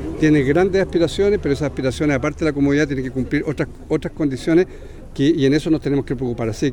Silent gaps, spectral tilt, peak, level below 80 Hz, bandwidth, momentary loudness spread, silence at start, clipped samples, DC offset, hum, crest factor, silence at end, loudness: none; -7 dB/octave; -4 dBFS; -36 dBFS; 11.5 kHz; 8 LU; 0 s; under 0.1%; under 0.1%; none; 14 dB; 0 s; -19 LUFS